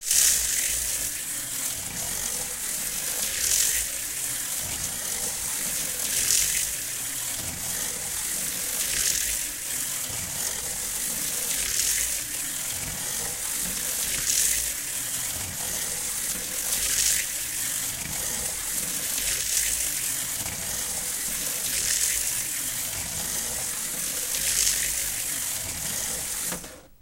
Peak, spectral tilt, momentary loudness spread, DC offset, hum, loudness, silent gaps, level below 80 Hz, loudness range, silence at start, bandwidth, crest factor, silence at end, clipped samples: -2 dBFS; 0.5 dB/octave; 7 LU; under 0.1%; none; -25 LUFS; none; -50 dBFS; 1 LU; 0 s; 16 kHz; 26 dB; 0.05 s; under 0.1%